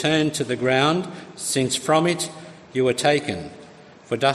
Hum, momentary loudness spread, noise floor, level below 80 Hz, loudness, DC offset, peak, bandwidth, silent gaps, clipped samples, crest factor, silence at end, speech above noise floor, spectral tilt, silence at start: none; 12 LU; -46 dBFS; -62 dBFS; -22 LUFS; under 0.1%; -4 dBFS; 13.5 kHz; none; under 0.1%; 18 dB; 0 s; 24 dB; -4 dB/octave; 0 s